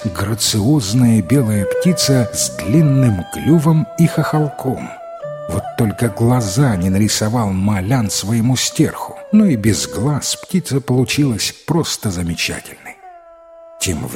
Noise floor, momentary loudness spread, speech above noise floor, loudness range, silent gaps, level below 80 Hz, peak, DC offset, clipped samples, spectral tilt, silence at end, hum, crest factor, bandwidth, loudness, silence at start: -40 dBFS; 9 LU; 25 dB; 4 LU; none; -42 dBFS; -2 dBFS; under 0.1%; under 0.1%; -5 dB/octave; 0 s; none; 14 dB; 16.5 kHz; -16 LUFS; 0 s